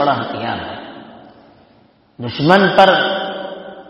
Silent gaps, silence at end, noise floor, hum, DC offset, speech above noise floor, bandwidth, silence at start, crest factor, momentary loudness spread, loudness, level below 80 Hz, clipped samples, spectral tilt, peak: none; 0.1 s; -51 dBFS; none; under 0.1%; 37 dB; 10 kHz; 0 s; 18 dB; 20 LU; -14 LUFS; -54 dBFS; 0.2%; -6.5 dB/octave; 0 dBFS